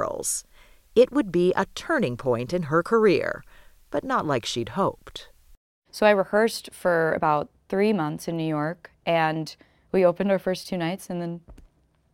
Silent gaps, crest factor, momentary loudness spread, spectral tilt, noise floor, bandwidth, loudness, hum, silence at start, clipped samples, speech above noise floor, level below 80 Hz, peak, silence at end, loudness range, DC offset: 5.57-5.82 s; 20 dB; 12 LU; -5 dB/octave; -59 dBFS; 17 kHz; -24 LUFS; none; 0 s; under 0.1%; 36 dB; -54 dBFS; -6 dBFS; 0.55 s; 3 LU; under 0.1%